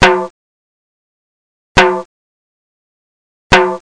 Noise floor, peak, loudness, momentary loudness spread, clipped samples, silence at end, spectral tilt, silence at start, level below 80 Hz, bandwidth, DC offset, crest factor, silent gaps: under -90 dBFS; 0 dBFS; -12 LUFS; 11 LU; under 0.1%; 0.05 s; -4 dB/octave; 0 s; -34 dBFS; 10.5 kHz; under 0.1%; 16 dB; 0.30-1.75 s, 2.05-3.50 s